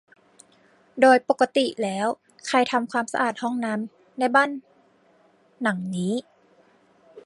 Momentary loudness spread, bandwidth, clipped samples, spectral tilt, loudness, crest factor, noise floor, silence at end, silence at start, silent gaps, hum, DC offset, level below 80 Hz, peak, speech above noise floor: 13 LU; 11.5 kHz; under 0.1%; -4.5 dB/octave; -23 LUFS; 20 dB; -60 dBFS; 0.05 s; 0.95 s; none; none; under 0.1%; -76 dBFS; -4 dBFS; 37 dB